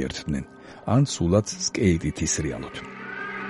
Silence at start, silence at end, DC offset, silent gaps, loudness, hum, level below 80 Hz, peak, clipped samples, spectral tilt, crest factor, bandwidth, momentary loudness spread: 0 s; 0 s; under 0.1%; none; -25 LUFS; none; -42 dBFS; -6 dBFS; under 0.1%; -5 dB/octave; 20 dB; 11.5 kHz; 14 LU